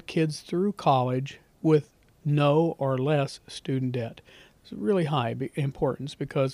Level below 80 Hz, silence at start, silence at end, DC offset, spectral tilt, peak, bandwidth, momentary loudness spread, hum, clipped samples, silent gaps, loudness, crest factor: -60 dBFS; 0.1 s; 0 s; under 0.1%; -7.5 dB/octave; -10 dBFS; 12 kHz; 11 LU; none; under 0.1%; none; -27 LUFS; 16 dB